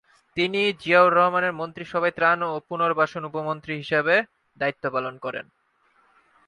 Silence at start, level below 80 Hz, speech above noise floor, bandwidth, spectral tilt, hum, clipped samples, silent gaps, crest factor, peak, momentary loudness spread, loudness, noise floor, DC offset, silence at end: 0.35 s; -66 dBFS; 41 dB; 10.5 kHz; -6 dB/octave; none; under 0.1%; none; 20 dB; -4 dBFS; 15 LU; -23 LUFS; -64 dBFS; under 0.1%; 1.05 s